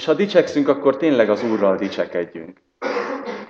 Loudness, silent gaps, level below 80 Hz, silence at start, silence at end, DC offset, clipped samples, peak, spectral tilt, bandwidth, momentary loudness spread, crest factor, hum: -19 LUFS; none; -68 dBFS; 0 s; 0.05 s; under 0.1%; under 0.1%; 0 dBFS; -6 dB/octave; 7.4 kHz; 11 LU; 18 dB; none